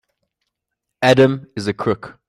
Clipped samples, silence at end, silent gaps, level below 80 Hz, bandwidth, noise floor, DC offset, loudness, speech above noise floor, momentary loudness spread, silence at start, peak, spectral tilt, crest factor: under 0.1%; 0.15 s; none; -54 dBFS; 14.5 kHz; -80 dBFS; under 0.1%; -17 LUFS; 63 dB; 11 LU; 1 s; -2 dBFS; -6 dB/octave; 18 dB